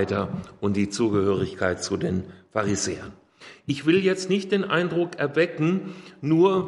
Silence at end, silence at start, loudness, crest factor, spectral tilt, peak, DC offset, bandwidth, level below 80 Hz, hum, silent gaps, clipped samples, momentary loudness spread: 0 s; 0 s; -24 LUFS; 18 dB; -5.5 dB/octave; -6 dBFS; under 0.1%; 11.5 kHz; -62 dBFS; none; none; under 0.1%; 10 LU